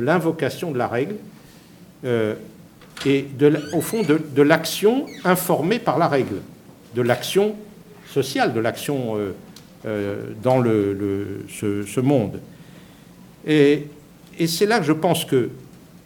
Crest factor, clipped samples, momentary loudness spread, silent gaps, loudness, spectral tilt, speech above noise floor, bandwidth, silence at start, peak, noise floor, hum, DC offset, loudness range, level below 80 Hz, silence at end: 22 dB; under 0.1%; 13 LU; none; -21 LUFS; -5.5 dB/octave; 26 dB; 19 kHz; 0 s; 0 dBFS; -46 dBFS; none; under 0.1%; 4 LU; -60 dBFS; 0.1 s